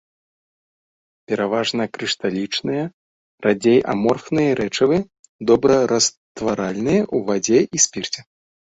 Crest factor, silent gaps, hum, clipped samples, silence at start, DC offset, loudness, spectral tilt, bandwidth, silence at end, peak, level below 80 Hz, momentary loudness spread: 18 dB; 2.94-3.38 s, 5.19-5.23 s, 5.29-5.39 s, 6.17-6.35 s; none; under 0.1%; 1.3 s; under 0.1%; -19 LUFS; -4 dB/octave; 8.2 kHz; 0.5 s; -2 dBFS; -56 dBFS; 11 LU